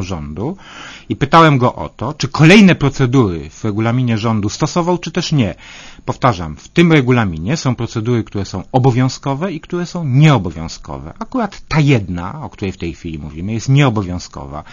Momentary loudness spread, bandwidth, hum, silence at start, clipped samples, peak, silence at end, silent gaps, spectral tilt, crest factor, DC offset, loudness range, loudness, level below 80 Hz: 16 LU; 8.8 kHz; none; 0 s; 0.2%; 0 dBFS; 0 s; none; -6.5 dB/octave; 14 dB; under 0.1%; 5 LU; -15 LUFS; -38 dBFS